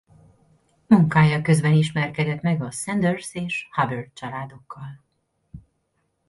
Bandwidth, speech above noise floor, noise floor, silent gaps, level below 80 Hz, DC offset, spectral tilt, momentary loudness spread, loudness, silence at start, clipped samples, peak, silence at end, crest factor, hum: 11.5 kHz; 50 dB; -72 dBFS; none; -56 dBFS; under 0.1%; -6.5 dB/octave; 19 LU; -21 LUFS; 0.9 s; under 0.1%; -4 dBFS; 0.7 s; 20 dB; none